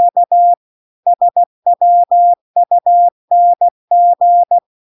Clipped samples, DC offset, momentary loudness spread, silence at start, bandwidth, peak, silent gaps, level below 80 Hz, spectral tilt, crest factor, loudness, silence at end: under 0.1%; under 0.1%; 5 LU; 0 s; 1 kHz; -4 dBFS; 0.57-1.03 s, 1.46-1.63 s, 2.41-2.54 s, 3.12-3.28 s, 3.71-3.88 s; -84 dBFS; -8 dB/octave; 6 dB; -12 LUFS; 0.4 s